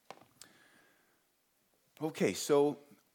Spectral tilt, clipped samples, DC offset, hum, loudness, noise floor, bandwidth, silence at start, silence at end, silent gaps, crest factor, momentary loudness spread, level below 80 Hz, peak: -4.5 dB/octave; under 0.1%; under 0.1%; none; -33 LUFS; -76 dBFS; 18.5 kHz; 2 s; 0.35 s; none; 20 dB; 18 LU; -86 dBFS; -18 dBFS